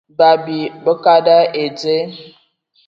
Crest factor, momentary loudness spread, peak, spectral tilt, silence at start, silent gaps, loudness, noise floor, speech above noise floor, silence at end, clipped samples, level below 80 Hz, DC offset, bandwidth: 14 dB; 10 LU; 0 dBFS; -5.5 dB/octave; 0.2 s; none; -14 LUFS; -58 dBFS; 44 dB; 0.6 s; under 0.1%; -66 dBFS; under 0.1%; 7.2 kHz